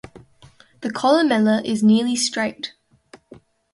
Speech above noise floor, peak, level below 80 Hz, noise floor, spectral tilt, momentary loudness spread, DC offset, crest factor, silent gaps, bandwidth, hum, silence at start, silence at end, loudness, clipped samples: 33 dB; -4 dBFS; -62 dBFS; -51 dBFS; -4.5 dB/octave; 15 LU; under 0.1%; 16 dB; none; 11.5 kHz; none; 0.8 s; 1.05 s; -19 LUFS; under 0.1%